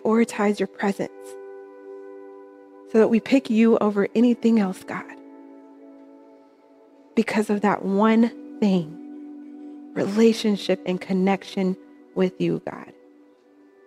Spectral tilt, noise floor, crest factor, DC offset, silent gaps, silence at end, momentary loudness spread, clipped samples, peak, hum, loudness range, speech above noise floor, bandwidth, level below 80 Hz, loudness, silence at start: -6.5 dB/octave; -54 dBFS; 18 dB; under 0.1%; none; 0.95 s; 22 LU; under 0.1%; -6 dBFS; none; 5 LU; 33 dB; 12.5 kHz; -72 dBFS; -22 LUFS; 0.05 s